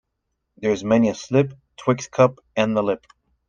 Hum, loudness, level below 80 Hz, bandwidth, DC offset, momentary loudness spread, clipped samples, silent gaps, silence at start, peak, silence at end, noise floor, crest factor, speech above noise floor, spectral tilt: none; -21 LUFS; -58 dBFS; 7.6 kHz; under 0.1%; 9 LU; under 0.1%; none; 0.6 s; -2 dBFS; 0.55 s; -77 dBFS; 20 dB; 56 dB; -6.5 dB/octave